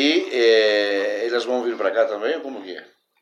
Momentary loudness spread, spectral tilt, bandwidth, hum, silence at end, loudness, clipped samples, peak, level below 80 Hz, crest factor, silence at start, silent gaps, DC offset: 17 LU; -2.5 dB/octave; 10.5 kHz; none; 0.4 s; -20 LUFS; under 0.1%; -6 dBFS; -86 dBFS; 16 dB; 0 s; none; under 0.1%